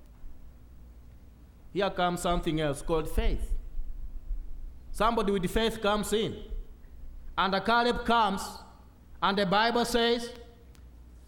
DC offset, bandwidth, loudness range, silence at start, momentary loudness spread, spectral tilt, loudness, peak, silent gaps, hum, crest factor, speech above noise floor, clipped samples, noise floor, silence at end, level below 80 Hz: under 0.1%; 18 kHz; 5 LU; 0 s; 20 LU; -4.5 dB/octave; -28 LUFS; -12 dBFS; none; 60 Hz at -55 dBFS; 18 dB; 24 dB; under 0.1%; -51 dBFS; 0 s; -38 dBFS